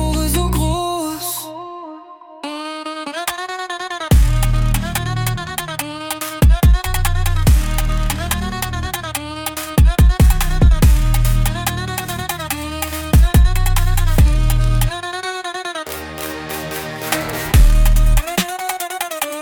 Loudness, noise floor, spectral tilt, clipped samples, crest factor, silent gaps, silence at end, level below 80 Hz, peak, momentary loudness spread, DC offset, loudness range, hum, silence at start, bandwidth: -18 LUFS; -38 dBFS; -5 dB/octave; under 0.1%; 14 dB; none; 0 s; -18 dBFS; -2 dBFS; 12 LU; under 0.1%; 5 LU; none; 0 s; 19 kHz